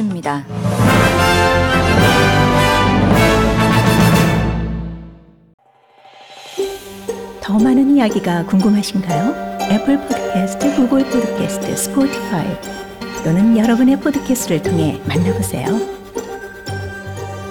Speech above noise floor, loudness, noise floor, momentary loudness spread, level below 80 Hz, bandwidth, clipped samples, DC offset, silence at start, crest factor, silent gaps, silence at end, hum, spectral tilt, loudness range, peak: 32 dB; -15 LUFS; -48 dBFS; 15 LU; -32 dBFS; 18.5 kHz; under 0.1%; under 0.1%; 0 s; 14 dB; 5.54-5.58 s; 0 s; none; -5.5 dB/octave; 7 LU; -2 dBFS